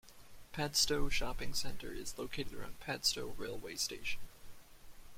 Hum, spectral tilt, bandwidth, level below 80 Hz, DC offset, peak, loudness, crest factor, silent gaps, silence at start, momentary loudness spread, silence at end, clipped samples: none; -2 dB/octave; 16.5 kHz; -48 dBFS; under 0.1%; -18 dBFS; -38 LUFS; 20 dB; none; 0.05 s; 13 LU; 0 s; under 0.1%